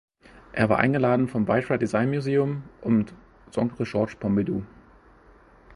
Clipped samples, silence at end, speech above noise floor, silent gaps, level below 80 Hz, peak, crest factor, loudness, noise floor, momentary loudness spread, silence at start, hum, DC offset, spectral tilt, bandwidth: under 0.1%; 0 s; 30 dB; none; -54 dBFS; -2 dBFS; 22 dB; -25 LUFS; -53 dBFS; 11 LU; 0.55 s; none; under 0.1%; -8 dB/octave; 11.5 kHz